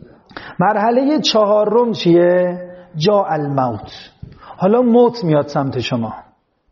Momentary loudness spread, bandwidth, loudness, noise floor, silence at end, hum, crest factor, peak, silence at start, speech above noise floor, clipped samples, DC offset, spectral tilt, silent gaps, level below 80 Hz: 18 LU; 7.2 kHz; -15 LUFS; -36 dBFS; 0.5 s; none; 14 dB; -2 dBFS; 0.35 s; 21 dB; under 0.1%; under 0.1%; -5 dB/octave; none; -54 dBFS